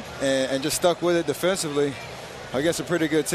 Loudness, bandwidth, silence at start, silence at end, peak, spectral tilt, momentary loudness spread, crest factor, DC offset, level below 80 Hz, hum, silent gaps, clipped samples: -24 LUFS; 14.5 kHz; 0 s; 0 s; -8 dBFS; -4 dB/octave; 9 LU; 16 dB; under 0.1%; -54 dBFS; none; none; under 0.1%